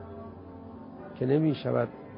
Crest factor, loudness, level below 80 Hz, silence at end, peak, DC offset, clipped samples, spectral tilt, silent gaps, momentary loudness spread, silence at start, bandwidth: 18 dB; -28 LUFS; -58 dBFS; 0 s; -12 dBFS; under 0.1%; under 0.1%; -11.5 dB/octave; none; 19 LU; 0 s; 5.4 kHz